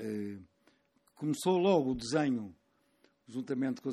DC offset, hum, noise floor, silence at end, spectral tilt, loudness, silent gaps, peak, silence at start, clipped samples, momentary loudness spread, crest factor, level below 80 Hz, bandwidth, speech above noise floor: under 0.1%; none; -71 dBFS; 0 s; -6 dB/octave; -33 LUFS; none; -14 dBFS; 0 s; under 0.1%; 16 LU; 20 dB; -64 dBFS; 14 kHz; 39 dB